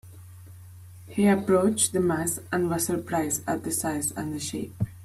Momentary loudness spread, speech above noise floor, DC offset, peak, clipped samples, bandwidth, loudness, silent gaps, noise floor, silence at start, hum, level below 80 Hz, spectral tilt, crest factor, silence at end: 10 LU; 20 dB; under 0.1%; -8 dBFS; under 0.1%; 15.5 kHz; -26 LUFS; none; -45 dBFS; 0.05 s; none; -58 dBFS; -4.5 dB/octave; 18 dB; 0 s